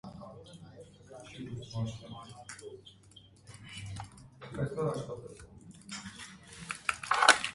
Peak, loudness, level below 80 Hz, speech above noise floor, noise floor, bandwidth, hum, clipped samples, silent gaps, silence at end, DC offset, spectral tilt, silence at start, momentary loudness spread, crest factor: -4 dBFS; -34 LUFS; -62 dBFS; 21 dB; -58 dBFS; 11.5 kHz; none; under 0.1%; none; 0 s; under 0.1%; -3 dB/octave; 0.05 s; 20 LU; 34 dB